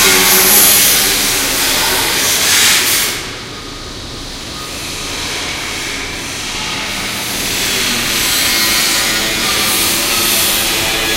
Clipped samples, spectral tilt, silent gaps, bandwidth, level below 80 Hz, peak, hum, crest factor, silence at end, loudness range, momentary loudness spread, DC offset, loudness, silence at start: under 0.1%; -0.5 dB/octave; none; over 20 kHz; -34 dBFS; 0 dBFS; none; 14 dB; 0 s; 11 LU; 17 LU; under 0.1%; -11 LUFS; 0 s